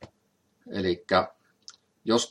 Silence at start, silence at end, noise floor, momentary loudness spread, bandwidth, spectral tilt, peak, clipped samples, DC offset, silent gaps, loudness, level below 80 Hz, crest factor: 0 s; 0.05 s; -71 dBFS; 24 LU; 12 kHz; -4 dB/octave; -8 dBFS; under 0.1%; under 0.1%; none; -28 LUFS; -70 dBFS; 22 dB